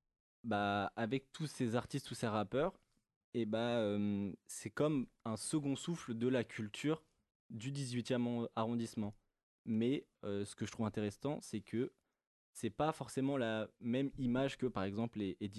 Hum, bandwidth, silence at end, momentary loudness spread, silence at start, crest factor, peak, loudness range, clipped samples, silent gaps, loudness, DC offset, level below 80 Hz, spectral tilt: none; 12 kHz; 0 s; 8 LU; 0.45 s; 20 dB; -20 dBFS; 2 LU; under 0.1%; 3.16-3.33 s, 7.35-7.49 s, 9.43-9.65 s, 12.27-12.53 s; -40 LUFS; under 0.1%; -68 dBFS; -6 dB/octave